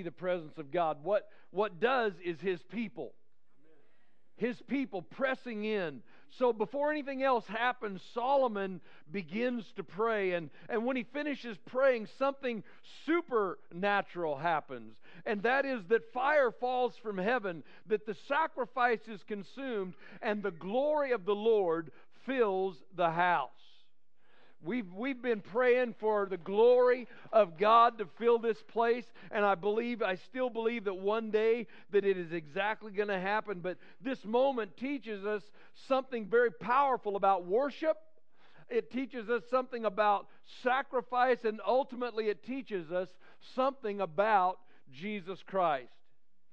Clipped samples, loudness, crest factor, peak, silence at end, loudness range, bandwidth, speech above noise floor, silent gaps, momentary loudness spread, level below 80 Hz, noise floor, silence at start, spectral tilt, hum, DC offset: under 0.1%; -33 LUFS; 20 dB; -12 dBFS; 0.65 s; 6 LU; 7.2 kHz; 49 dB; none; 11 LU; -84 dBFS; -81 dBFS; 0 s; -7 dB/octave; none; 0.3%